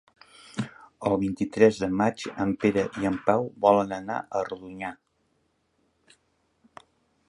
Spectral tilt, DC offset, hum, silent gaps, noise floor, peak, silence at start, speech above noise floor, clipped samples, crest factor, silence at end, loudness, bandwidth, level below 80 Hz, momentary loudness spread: -6.5 dB/octave; under 0.1%; none; none; -71 dBFS; -4 dBFS; 0.55 s; 46 dB; under 0.1%; 22 dB; 2.35 s; -26 LUFS; 11.5 kHz; -58 dBFS; 14 LU